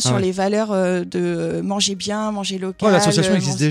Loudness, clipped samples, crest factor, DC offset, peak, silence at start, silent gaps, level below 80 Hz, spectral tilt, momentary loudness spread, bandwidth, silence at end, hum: -19 LUFS; under 0.1%; 14 dB; under 0.1%; -4 dBFS; 0 s; none; -54 dBFS; -4.5 dB/octave; 7 LU; 15.5 kHz; 0 s; none